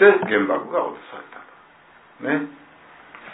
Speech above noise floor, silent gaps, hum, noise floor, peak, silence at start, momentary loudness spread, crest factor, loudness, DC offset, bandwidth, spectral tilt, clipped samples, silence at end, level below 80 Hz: 31 dB; none; none; -51 dBFS; -2 dBFS; 0 s; 22 LU; 22 dB; -22 LUFS; under 0.1%; 4 kHz; -9.5 dB/octave; under 0.1%; 0 s; -72 dBFS